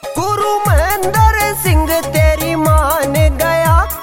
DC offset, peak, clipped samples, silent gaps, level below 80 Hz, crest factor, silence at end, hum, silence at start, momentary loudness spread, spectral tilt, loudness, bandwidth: under 0.1%; 0 dBFS; under 0.1%; none; -18 dBFS; 12 dB; 0 s; none; 0.05 s; 3 LU; -5 dB/octave; -13 LUFS; 16.5 kHz